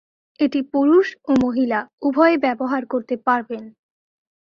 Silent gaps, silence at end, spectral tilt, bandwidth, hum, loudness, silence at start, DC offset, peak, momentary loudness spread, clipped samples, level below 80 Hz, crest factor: 1.93-1.98 s; 0.7 s; -6.5 dB/octave; 7 kHz; none; -19 LUFS; 0.4 s; under 0.1%; -2 dBFS; 8 LU; under 0.1%; -58 dBFS; 18 dB